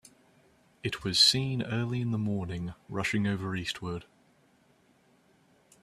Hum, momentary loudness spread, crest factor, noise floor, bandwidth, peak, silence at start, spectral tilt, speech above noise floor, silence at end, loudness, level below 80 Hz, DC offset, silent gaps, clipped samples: none; 16 LU; 24 dB; -65 dBFS; 14.5 kHz; -8 dBFS; 0.85 s; -4 dB/octave; 35 dB; 1.8 s; -29 LUFS; -60 dBFS; under 0.1%; none; under 0.1%